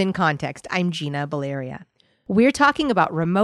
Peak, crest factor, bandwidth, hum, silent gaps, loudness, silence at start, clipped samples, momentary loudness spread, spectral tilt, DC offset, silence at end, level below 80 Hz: -4 dBFS; 18 dB; 12.5 kHz; none; none; -21 LUFS; 0 s; under 0.1%; 12 LU; -6 dB/octave; under 0.1%; 0 s; -54 dBFS